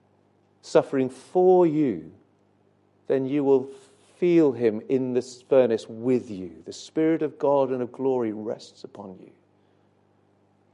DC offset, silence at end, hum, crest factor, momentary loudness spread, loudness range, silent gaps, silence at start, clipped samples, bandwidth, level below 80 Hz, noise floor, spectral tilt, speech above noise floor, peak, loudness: under 0.1%; 1.6 s; 50 Hz at -60 dBFS; 20 dB; 18 LU; 4 LU; none; 0.65 s; under 0.1%; 11 kHz; -70 dBFS; -63 dBFS; -7.5 dB/octave; 40 dB; -6 dBFS; -24 LUFS